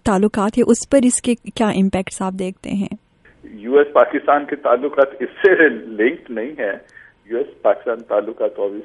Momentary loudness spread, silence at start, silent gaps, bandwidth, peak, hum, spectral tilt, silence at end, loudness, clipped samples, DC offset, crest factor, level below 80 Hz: 11 LU; 0.05 s; none; 11.5 kHz; 0 dBFS; none; -5 dB/octave; 0 s; -18 LUFS; under 0.1%; under 0.1%; 18 dB; -48 dBFS